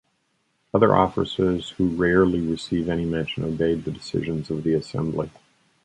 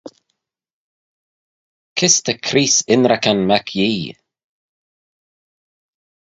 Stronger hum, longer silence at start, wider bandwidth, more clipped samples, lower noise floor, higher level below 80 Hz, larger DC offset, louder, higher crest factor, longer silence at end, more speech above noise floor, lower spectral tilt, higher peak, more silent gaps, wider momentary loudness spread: neither; first, 0.75 s vs 0.05 s; first, 11 kHz vs 8 kHz; neither; second, -70 dBFS vs -74 dBFS; first, -46 dBFS vs -60 dBFS; neither; second, -23 LUFS vs -15 LUFS; about the same, 20 dB vs 20 dB; second, 0.55 s vs 2.2 s; second, 48 dB vs 59 dB; first, -7 dB/octave vs -3 dB/octave; about the same, -2 dBFS vs 0 dBFS; second, none vs 0.71-1.96 s; about the same, 9 LU vs 9 LU